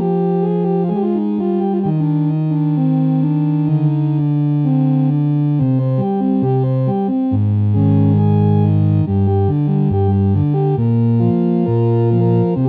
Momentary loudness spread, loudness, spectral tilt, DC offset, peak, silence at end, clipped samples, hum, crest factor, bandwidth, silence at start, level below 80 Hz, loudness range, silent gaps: 3 LU; -16 LUFS; -13 dB/octave; under 0.1%; -4 dBFS; 0 s; under 0.1%; none; 10 dB; 3.9 kHz; 0 s; -50 dBFS; 2 LU; none